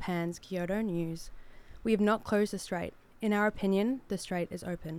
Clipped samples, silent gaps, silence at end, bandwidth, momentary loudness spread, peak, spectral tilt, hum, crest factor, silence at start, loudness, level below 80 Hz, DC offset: under 0.1%; none; 0 s; 15.5 kHz; 11 LU; -14 dBFS; -6 dB/octave; none; 18 dB; 0 s; -32 LUFS; -54 dBFS; under 0.1%